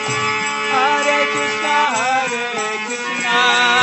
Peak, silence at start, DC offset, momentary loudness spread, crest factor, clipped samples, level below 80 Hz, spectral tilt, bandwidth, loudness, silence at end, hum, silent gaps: 0 dBFS; 0 s; under 0.1%; 8 LU; 18 dB; under 0.1%; -64 dBFS; -1.5 dB/octave; 8.4 kHz; -16 LUFS; 0 s; none; none